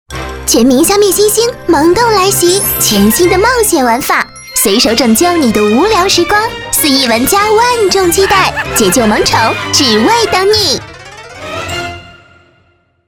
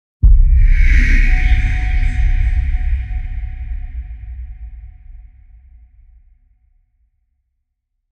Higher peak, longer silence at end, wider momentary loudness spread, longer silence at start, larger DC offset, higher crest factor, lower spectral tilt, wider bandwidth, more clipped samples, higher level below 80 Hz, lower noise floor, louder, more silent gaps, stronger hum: about the same, 0 dBFS vs 0 dBFS; second, 0.95 s vs 2.9 s; second, 10 LU vs 19 LU; second, 0.1 s vs 0.25 s; neither; about the same, 10 dB vs 14 dB; second, -3 dB/octave vs -6.5 dB/octave; first, over 20 kHz vs 6.2 kHz; first, 0.1% vs under 0.1%; second, -32 dBFS vs -16 dBFS; second, -52 dBFS vs -72 dBFS; first, -9 LUFS vs -17 LUFS; neither; neither